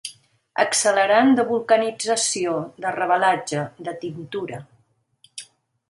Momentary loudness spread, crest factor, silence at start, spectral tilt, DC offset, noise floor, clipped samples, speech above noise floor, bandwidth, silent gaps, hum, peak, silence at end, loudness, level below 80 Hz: 20 LU; 20 dB; 0.05 s; -3 dB/octave; under 0.1%; -63 dBFS; under 0.1%; 43 dB; 11.5 kHz; none; none; -2 dBFS; 0.45 s; -21 LUFS; -70 dBFS